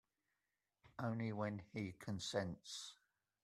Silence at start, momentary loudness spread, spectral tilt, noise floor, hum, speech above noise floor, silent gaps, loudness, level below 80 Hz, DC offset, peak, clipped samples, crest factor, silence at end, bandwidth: 0.85 s; 8 LU; -5 dB/octave; under -90 dBFS; none; over 45 dB; none; -46 LUFS; -78 dBFS; under 0.1%; -24 dBFS; under 0.1%; 24 dB; 0.5 s; 14 kHz